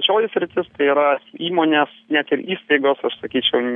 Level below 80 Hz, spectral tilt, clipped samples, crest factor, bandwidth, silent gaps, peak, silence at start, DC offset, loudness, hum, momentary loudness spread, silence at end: -66 dBFS; -7.5 dB/octave; under 0.1%; 16 dB; 3.9 kHz; none; -2 dBFS; 0 s; under 0.1%; -19 LUFS; none; 6 LU; 0 s